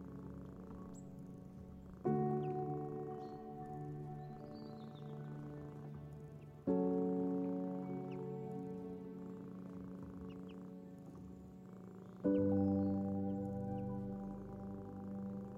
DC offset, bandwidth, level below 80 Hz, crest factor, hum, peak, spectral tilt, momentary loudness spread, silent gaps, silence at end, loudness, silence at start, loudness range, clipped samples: under 0.1%; 8.2 kHz; -66 dBFS; 18 dB; none; -24 dBFS; -10 dB/octave; 17 LU; none; 0 s; -43 LUFS; 0 s; 10 LU; under 0.1%